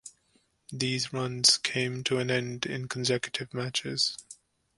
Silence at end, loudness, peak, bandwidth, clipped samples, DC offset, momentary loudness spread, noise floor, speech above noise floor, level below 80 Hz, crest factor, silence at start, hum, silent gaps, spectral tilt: 0.45 s; -28 LUFS; -6 dBFS; 11.5 kHz; under 0.1%; under 0.1%; 12 LU; -70 dBFS; 40 dB; -68 dBFS; 24 dB; 0.05 s; none; none; -3 dB/octave